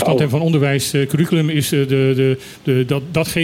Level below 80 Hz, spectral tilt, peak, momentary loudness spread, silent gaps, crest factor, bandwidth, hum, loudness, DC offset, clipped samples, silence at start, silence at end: -50 dBFS; -6 dB/octave; -4 dBFS; 3 LU; none; 12 dB; 17 kHz; none; -17 LUFS; under 0.1%; under 0.1%; 0 s; 0 s